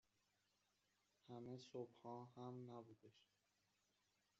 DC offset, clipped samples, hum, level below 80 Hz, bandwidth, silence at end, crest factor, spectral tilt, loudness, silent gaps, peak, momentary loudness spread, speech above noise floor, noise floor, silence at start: under 0.1%; under 0.1%; none; under -90 dBFS; 7.4 kHz; 1.15 s; 20 dB; -7 dB/octave; -58 LUFS; none; -40 dBFS; 6 LU; 29 dB; -87 dBFS; 1.25 s